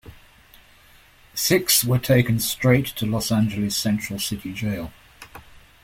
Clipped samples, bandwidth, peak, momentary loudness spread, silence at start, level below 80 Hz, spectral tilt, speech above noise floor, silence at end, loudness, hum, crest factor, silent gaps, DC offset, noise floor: under 0.1%; 16.5 kHz; -4 dBFS; 14 LU; 0.05 s; -48 dBFS; -4.5 dB/octave; 31 dB; 0.45 s; -21 LUFS; none; 20 dB; none; under 0.1%; -52 dBFS